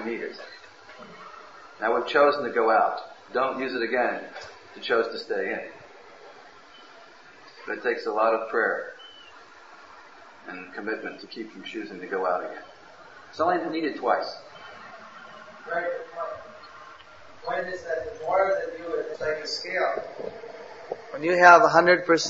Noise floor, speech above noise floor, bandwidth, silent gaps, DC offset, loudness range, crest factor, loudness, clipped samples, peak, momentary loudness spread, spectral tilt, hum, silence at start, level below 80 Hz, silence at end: -50 dBFS; 25 dB; 7.8 kHz; none; 0.1%; 9 LU; 24 dB; -25 LUFS; under 0.1%; -2 dBFS; 23 LU; -4 dB/octave; none; 0 s; -68 dBFS; 0 s